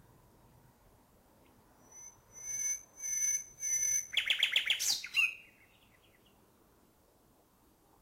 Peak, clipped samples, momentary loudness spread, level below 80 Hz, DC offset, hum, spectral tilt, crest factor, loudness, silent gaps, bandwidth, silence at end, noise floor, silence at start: -16 dBFS; under 0.1%; 22 LU; -72 dBFS; under 0.1%; none; 3 dB/octave; 22 dB; -31 LUFS; none; 16 kHz; 2.6 s; -67 dBFS; 1.9 s